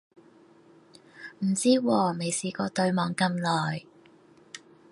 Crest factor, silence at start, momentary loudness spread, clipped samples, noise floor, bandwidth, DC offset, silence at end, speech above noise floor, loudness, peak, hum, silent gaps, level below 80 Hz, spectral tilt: 20 dB; 1.15 s; 23 LU; under 0.1%; -56 dBFS; 11.5 kHz; under 0.1%; 0.35 s; 30 dB; -27 LUFS; -10 dBFS; none; none; -72 dBFS; -5 dB/octave